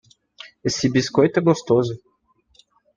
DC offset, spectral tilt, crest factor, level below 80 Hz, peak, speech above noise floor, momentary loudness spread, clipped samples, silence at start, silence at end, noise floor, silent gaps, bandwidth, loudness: under 0.1%; -5.5 dB/octave; 20 dB; -58 dBFS; -2 dBFS; 44 dB; 14 LU; under 0.1%; 0.45 s; 1 s; -63 dBFS; none; 9.8 kHz; -20 LUFS